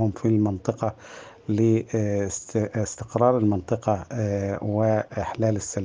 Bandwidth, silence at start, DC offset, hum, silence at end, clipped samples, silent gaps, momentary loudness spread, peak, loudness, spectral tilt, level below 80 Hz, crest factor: 9.8 kHz; 0 s; under 0.1%; none; 0 s; under 0.1%; none; 8 LU; -6 dBFS; -25 LUFS; -7 dB/octave; -56 dBFS; 18 dB